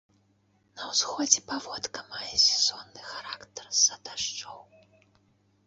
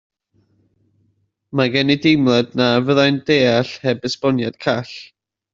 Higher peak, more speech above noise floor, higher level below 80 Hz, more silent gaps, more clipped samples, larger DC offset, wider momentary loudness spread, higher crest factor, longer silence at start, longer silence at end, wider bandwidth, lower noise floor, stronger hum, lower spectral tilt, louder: about the same, -4 dBFS vs -2 dBFS; second, 38 dB vs 48 dB; second, -68 dBFS vs -58 dBFS; neither; neither; neither; first, 19 LU vs 8 LU; first, 28 dB vs 16 dB; second, 0.75 s vs 1.55 s; first, 1.05 s vs 0.5 s; about the same, 8.2 kHz vs 7.6 kHz; about the same, -68 dBFS vs -65 dBFS; neither; second, 1 dB/octave vs -6 dB/octave; second, -26 LUFS vs -17 LUFS